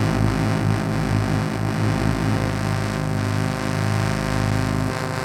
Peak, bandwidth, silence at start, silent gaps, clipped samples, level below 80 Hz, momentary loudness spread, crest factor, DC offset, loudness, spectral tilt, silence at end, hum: -8 dBFS; 15 kHz; 0 s; none; under 0.1%; -34 dBFS; 3 LU; 14 dB; under 0.1%; -22 LUFS; -6.5 dB/octave; 0 s; none